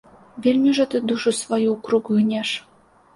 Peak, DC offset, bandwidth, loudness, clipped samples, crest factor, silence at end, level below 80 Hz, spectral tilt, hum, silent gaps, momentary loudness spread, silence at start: -8 dBFS; under 0.1%; 11.5 kHz; -21 LUFS; under 0.1%; 14 dB; 0.55 s; -64 dBFS; -4.5 dB/octave; none; none; 6 LU; 0.35 s